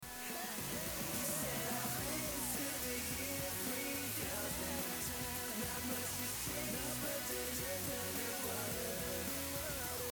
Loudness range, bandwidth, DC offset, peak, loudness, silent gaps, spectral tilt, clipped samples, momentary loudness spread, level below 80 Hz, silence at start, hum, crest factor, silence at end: 1 LU; over 20 kHz; under 0.1%; -26 dBFS; -39 LUFS; none; -2.5 dB/octave; under 0.1%; 2 LU; -58 dBFS; 0 s; none; 14 dB; 0 s